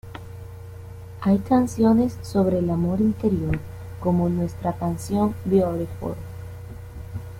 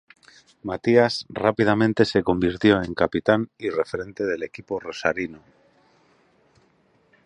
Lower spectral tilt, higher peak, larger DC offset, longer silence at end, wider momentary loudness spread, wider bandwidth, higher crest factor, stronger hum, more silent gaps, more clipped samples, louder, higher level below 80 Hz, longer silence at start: first, -8.5 dB/octave vs -6.5 dB/octave; second, -6 dBFS vs -2 dBFS; neither; second, 0 s vs 1.9 s; first, 20 LU vs 12 LU; first, 16 kHz vs 10.5 kHz; second, 16 dB vs 22 dB; neither; neither; neither; about the same, -23 LUFS vs -23 LUFS; first, -44 dBFS vs -52 dBFS; second, 0.05 s vs 0.65 s